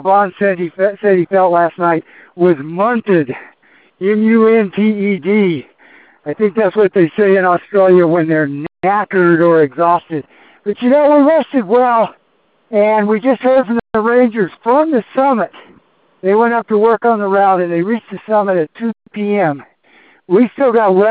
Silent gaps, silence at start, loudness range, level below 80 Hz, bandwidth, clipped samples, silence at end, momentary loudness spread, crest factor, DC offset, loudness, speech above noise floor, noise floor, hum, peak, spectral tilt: none; 0 s; 3 LU; -58 dBFS; 4.7 kHz; under 0.1%; 0 s; 10 LU; 12 dB; under 0.1%; -13 LUFS; 45 dB; -57 dBFS; none; 0 dBFS; -11 dB/octave